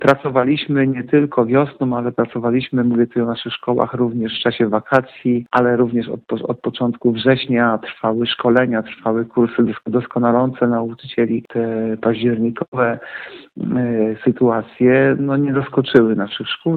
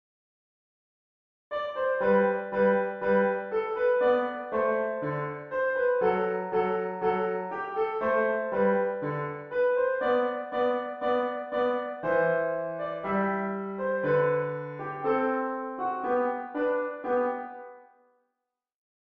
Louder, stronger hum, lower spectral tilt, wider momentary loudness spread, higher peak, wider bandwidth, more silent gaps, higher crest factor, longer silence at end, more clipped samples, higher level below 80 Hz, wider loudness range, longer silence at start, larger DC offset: first, -18 LUFS vs -28 LUFS; neither; about the same, -8.5 dB/octave vs -9 dB/octave; about the same, 7 LU vs 8 LU; first, 0 dBFS vs -12 dBFS; about the same, 5 kHz vs 5.2 kHz; first, 12.68-12.72 s vs none; about the same, 18 dB vs 16 dB; second, 0 s vs 1.2 s; neither; first, -56 dBFS vs -68 dBFS; about the same, 2 LU vs 3 LU; second, 0 s vs 1.5 s; neither